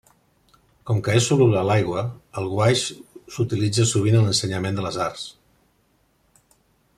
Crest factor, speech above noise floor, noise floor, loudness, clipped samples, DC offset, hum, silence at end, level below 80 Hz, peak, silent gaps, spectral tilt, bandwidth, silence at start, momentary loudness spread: 18 dB; 43 dB; -64 dBFS; -21 LUFS; under 0.1%; under 0.1%; none; 1.65 s; -56 dBFS; -4 dBFS; none; -5 dB/octave; 13 kHz; 0.85 s; 14 LU